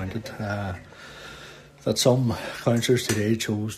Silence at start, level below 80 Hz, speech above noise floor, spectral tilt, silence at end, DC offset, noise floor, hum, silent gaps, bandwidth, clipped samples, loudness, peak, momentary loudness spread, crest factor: 0 s; -54 dBFS; 21 dB; -5 dB/octave; 0 s; under 0.1%; -45 dBFS; none; none; 14 kHz; under 0.1%; -25 LUFS; -6 dBFS; 20 LU; 20 dB